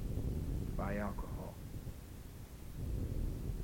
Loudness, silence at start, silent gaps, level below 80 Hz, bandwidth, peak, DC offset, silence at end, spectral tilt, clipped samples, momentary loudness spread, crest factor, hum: -43 LUFS; 0 s; none; -44 dBFS; 17 kHz; -26 dBFS; under 0.1%; 0 s; -7.5 dB/octave; under 0.1%; 12 LU; 16 dB; none